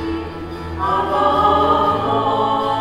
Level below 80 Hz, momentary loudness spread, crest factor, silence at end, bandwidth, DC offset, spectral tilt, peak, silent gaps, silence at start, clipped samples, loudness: -38 dBFS; 13 LU; 14 dB; 0 s; 14 kHz; under 0.1%; -6.5 dB/octave; -2 dBFS; none; 0 s; under 0.1%; -17 LUFS